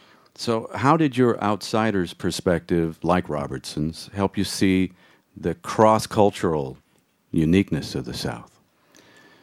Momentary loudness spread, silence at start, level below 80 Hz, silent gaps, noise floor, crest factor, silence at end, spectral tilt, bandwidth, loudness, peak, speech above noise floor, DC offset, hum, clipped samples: 11 LU; 0.4 s; -48 dBFS; none; -64 dBFS; 22 dB; 1 s; -6 dB/octave; 15.5 kHz; -23 LUFS; -2 dBFS; 42 dB; under 0.1%; none; under 0.1%